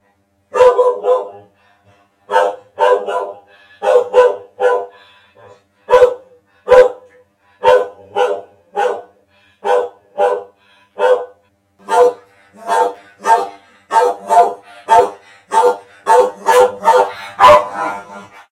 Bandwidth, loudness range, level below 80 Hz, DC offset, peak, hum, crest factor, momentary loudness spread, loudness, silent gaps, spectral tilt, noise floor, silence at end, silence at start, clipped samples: 13.5 kHz; 6 LU; -52 dBFS; under 0.1%; 0 dBFS; none; 14 dB; 15 LU; -14 LUFS; none; -3 dB/octave; -59 dBFS; 0.25 s; 0.55 s; 0.3%